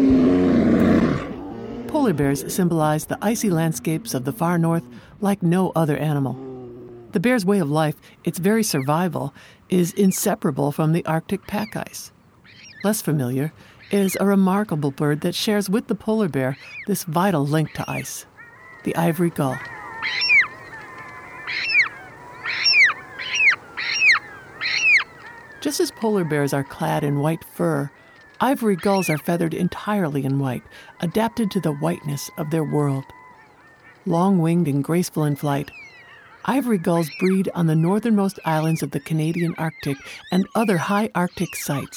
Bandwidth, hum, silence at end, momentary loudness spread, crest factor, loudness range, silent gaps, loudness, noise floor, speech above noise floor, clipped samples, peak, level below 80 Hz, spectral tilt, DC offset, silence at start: 19.5 kHz; none; 0 s; 14 LU; 18 dB; 5 LU; none; -21 LUFS; -50 dBFS; 28 dB; under 0.1%; -4 dBFS; -52 dBFS; -5.5 dB/octave; under 0.1%; 0 s